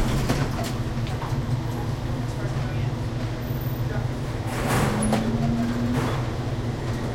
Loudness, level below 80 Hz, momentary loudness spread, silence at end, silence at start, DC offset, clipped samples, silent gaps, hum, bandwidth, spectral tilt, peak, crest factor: -26 LUFS; -36 dBFS; 5 LU; 0 s; 0 s; under 0.1%; under 0.1%; none; none; 16.5 kHz; -6 dB/octave; -10 dBFS; 16 dB